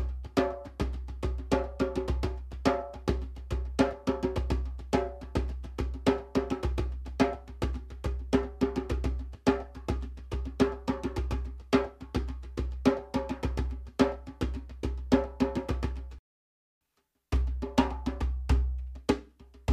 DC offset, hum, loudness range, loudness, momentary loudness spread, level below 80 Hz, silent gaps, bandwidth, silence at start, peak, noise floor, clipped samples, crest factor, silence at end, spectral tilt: under 0.1%; none; 2 LU; -32 LUFS; 8 LU; -36 dBFS; 16.19-16.81 s; 12 kHz; 0 s; -10 dBFS; -78 dBFS; under 0.1%; 22 dB; 0 s; -7 dB/octave